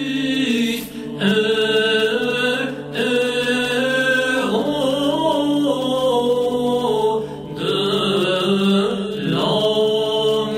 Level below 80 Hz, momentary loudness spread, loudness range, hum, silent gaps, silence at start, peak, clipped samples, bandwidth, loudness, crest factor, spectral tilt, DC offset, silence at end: -54 dBFS; 5 LU; 1 LU; none; none; 0 s; -4 dBFS; under 0.1%; 16 kHz; -18 LUFS; 14 dB; -4.5 dB/octave; under 0.1%; 0 s